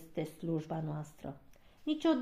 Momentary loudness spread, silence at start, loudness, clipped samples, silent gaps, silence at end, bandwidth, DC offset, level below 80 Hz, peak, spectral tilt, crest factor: 15 LU; 0 s; -38 LUFS; under 0.1%; none; 0 s; 14.5 kHz; under 0.1%; -66 dBFS; -18 dBFS; -7 dB/octave; 20 dB